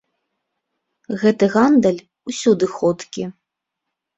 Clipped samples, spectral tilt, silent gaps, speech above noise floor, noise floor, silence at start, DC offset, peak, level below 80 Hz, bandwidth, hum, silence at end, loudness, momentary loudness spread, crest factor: under 0.1%; -6 dB/octave; none; 64 dB; -80 dBFS; 1.1 s; under 0.1%; -2 dBFS; -60 dBFS; 8.2 kHz; none; 0.85 s; -17 LUFS; 15 LU; 18 dB